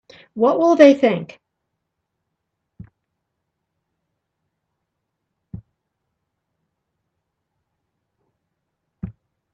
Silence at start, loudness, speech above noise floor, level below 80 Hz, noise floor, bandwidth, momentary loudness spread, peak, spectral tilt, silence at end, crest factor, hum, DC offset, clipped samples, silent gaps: 0.35 s; -15 LUFS; 63 dB; -58 dBFS; -78 dBFS; 7.8 kHz; 25 LU; 0 dBFS; -6.5 dB/octave; 0.45 s; 24 dB; none; under 0.1%; under 0.1%; none